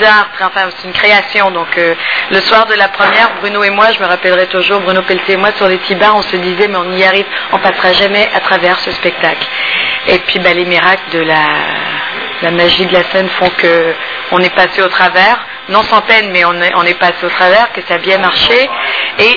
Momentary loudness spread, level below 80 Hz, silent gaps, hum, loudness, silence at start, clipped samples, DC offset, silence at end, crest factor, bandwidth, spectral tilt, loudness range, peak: 6 LU; -44 dBFS; none; none; -9 LUFS; 0 s; 1%; 0.5%; 0 s; 10 dB; 5.4 kHz; -5 dB/octave; 2 LU; 0 dBFS